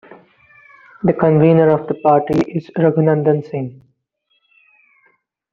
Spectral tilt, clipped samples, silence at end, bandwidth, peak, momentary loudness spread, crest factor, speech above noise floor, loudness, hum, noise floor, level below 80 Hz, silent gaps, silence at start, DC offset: -10 dB/octave; under 0.1%; 1.8 s; 6.4 kHz; -2 dBFS; 11 LU; 16 dB; 52 dB; -15 LUFS; none; -66 dBFS; -54 dBFS; none; 1.05 s; under 0.1%